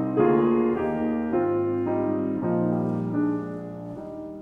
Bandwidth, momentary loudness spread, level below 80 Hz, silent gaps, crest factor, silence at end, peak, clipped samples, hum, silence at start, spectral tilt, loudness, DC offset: 3.6 kHz; 15 LU; -56 dBFS; none; 16 dB; 0 s; -8 dBFS; under 0.1%; none; 0 s; -10.5 dB/octave; -25 LUFS; under 0.1%